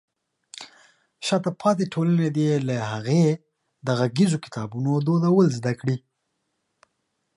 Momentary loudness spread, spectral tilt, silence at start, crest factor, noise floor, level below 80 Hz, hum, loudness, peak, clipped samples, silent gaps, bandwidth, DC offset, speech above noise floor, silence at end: 13 LU; -7 dB/octave; 0.6 s; 16 dB; -76 dBFS; -66 dBFS; none; -23 LUFS; -8 dBFS; under 0.1%; none; 11.5 kHz; under 0.1%; 54 dB; 1.4 s